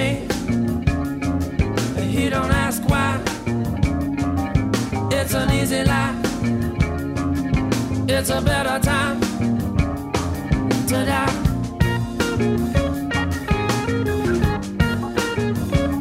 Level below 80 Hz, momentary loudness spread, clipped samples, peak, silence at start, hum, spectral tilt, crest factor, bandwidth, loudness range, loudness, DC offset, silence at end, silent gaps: -30 dBFS; 4 LU; under 0.1%; -4 dBFS; 0 s; none; -5.5 dB/octave; 16 dB; 16 kHz; 1 LU; -21 LUFS; under 0.1%; 0 s; none